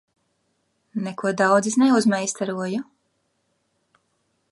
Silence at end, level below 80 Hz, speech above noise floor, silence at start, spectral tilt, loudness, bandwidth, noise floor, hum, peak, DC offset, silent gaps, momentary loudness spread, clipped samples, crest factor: 1.7 s; -76 dBFS; 50 dB; 0.95 s; -4.5 dB/octave; -21 LUFS; 11.5 kHz; -71 dBFS; none; -4 dBFS; under 0.1%; none; 13 LU; under 0.1%; 20 dB